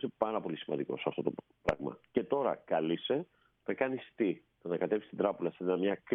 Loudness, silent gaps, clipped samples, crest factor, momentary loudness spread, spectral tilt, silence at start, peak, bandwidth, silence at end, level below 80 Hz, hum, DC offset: -35 LUFS; none; under 0.1%; 20 dB; 6 LU; -4.5 dB/octave; 0 s; -14 dBFS; 4.9 kHz; 0 s; -64 dBFS; none; under 0.1%